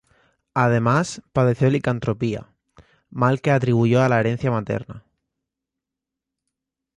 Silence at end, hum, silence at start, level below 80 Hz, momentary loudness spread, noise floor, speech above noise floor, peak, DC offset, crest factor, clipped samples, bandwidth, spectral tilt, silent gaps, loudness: 1.95 s; none; 0.55 s; -54 dBFS; 11 LU; -85 dBFS; 66 dB; -4 dBFS; under 0.1%; 18 dB; under 0.1%; 10.5 kHz; -7.5 dB/octave; none; -21 LUFS